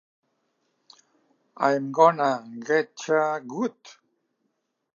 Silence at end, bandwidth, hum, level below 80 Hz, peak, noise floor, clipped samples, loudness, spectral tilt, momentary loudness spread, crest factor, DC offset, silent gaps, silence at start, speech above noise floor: 1.05 s; 7.4 kHz; none; -86 dBFS; -4 dBFS; -76 dBFS; under 0.1%; -24 LUFS; -5 dB/octave; 11 LU; 24 dB; under 0.1%; none; 1.6 s; 53 dB